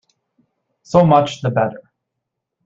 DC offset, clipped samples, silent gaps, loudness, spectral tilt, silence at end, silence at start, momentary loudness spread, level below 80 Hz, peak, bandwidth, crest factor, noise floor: under 0.1%; under 0.1%; none; -16 LUFS; -7 dB/octave; 0.9 s; 0.9 s; 8 LU; -54 dBFS; -2 dBFS; 7.8 kHz; 18 dB; -79 dBFS